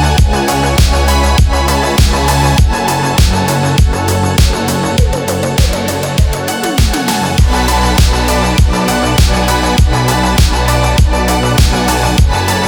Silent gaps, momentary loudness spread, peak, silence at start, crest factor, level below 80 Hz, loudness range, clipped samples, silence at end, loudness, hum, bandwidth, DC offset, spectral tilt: none; 3 LU; 0 dBFS; 0 s; 10 dB; -14 dBFS; 2 LU; under 0.1%; 0 s; -11 LUFS; none; over 20 kHz; 0.2%; -4.5 dB/octave